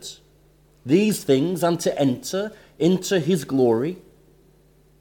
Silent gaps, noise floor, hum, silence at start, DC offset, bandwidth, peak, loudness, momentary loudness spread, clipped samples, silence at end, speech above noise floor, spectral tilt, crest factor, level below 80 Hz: none; -56 dBFS; none; 0 s; under 0.1%; 18 kHz; -6 dBFS; -22 LUFS; 12 LU; under 0.1%; 1.05 s; 35 dB; -5.5 dB/octave; 16 dB; -60 dBFS